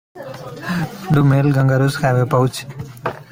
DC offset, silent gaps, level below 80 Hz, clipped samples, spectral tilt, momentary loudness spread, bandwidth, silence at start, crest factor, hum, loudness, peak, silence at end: under 0.1%; none; -48 dBFS; under 0.1%; -7 dB/octave; 18 LU; 16 kHz; 0.15 s; 14 dB; none; -17 LUFS; -2 dBFS; 0.1 s